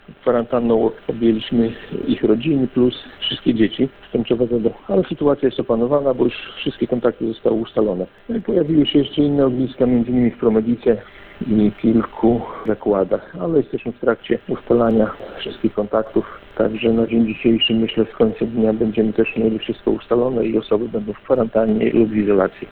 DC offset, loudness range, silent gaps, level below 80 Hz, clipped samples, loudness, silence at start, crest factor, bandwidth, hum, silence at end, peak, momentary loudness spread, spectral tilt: under 0.1%; 2 LU; none; -44 dBFS; under 0.1%; -19 LUFS; 0.1 s; 16 dB; 4.4 kHz; none; 0 s; -2 dBFS; 7 LU; -10 dB/octave